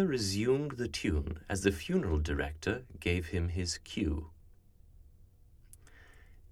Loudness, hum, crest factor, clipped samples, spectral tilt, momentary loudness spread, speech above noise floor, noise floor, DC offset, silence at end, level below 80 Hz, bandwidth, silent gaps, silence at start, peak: -34 LUFS; none; 22 dB; under 0.1%; -5.5 dB/octave; 6 LU; 26 dB; -59 dBFS; under 0.1%; 0.05 s; -44 dBFS; 15.5 kHz; none; 0 s; -14 dBFS